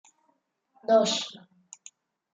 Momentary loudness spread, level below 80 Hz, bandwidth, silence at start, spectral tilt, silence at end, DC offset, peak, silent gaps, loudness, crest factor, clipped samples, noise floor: 25 LU; -82 dBFS; 9.4 kHz; 0.9 s; -3 dB/octave; 1 s; under 0.1%; -8 dBFS; none; -24 LUFS; 22 dB; under 0.1%; -73 dBFS